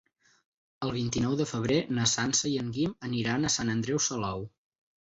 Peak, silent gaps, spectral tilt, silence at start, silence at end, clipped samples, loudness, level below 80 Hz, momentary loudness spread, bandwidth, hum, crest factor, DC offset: -12 dBFS; none; -4 dB/octave; 0.8 s; 0.6 s; under 0.1%; -29 LUFS; -56 dBFS; 8 LU; 8.4 kHz; none; 18 dB; under 0.1%